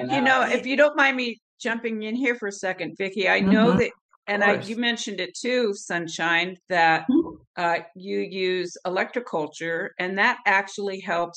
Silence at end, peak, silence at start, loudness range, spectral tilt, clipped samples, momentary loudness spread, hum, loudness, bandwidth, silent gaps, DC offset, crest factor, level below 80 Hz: 0.05 s; -6 dBFS; 0 s; 2 LU; -4.5 dB/octave; under 0.1%; 10 LU; none; -23 LUFS; 9.6 kHz; 1.42-1.57 s, 4.01-4.09 s, 4.16-4.23 s, 7.47-7.54 s; under 0.1%; 18 dB; -62 dBFS